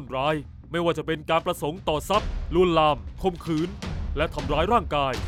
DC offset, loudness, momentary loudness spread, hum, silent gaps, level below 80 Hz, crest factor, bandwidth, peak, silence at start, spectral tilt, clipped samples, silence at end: under 0.1%; -25 LUFS; 8 LU; none; none; -36 dBFS; 18 dB; 16 kHz; -8 dBFS; 0 s; -6 dB/octave; under 0.1%; 0 s